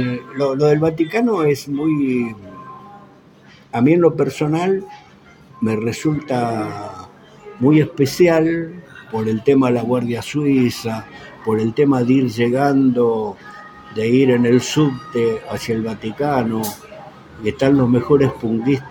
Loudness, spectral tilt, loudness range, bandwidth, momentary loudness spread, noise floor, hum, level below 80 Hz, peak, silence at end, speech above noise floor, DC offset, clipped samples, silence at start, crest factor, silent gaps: -18 LUFS; -7 dB/octave; 3 LU; 17 kHz; 16 LU; -46 dBFS; none; -52 dBFS; -2 dBFS; 0 s; 29 dB; under 0.1%; under 0.1%; 0 s; 16 dB; none